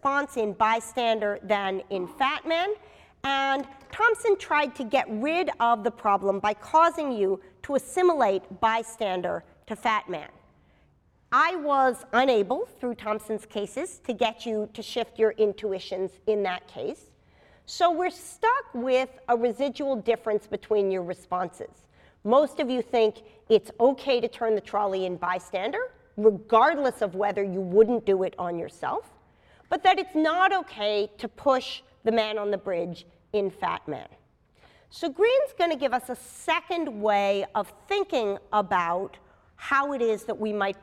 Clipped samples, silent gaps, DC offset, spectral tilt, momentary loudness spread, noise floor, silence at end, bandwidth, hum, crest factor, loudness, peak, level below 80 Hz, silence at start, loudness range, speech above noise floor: under 0.1%; none; under 0.1%; -4.5 dB/octave; 11 LU; -63 dBFS; 0.1 s; 14 kHz; none; 20 dB; -26 LUFS; -8 dBFS; -64 dBFS; 0.05 s; 4 LU; 37 dB